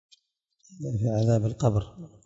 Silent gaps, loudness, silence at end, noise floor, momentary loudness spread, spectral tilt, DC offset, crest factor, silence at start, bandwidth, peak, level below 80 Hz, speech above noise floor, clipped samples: none; -26 LUFS; 0.2 s; -72 dBFS; 13 LU; -8 dB/octave; under 0.1%; 16 dB; 0.7 s; 7.8 kHz; -10 dBFS; -54 dBFS; 47 dB; under 0.1%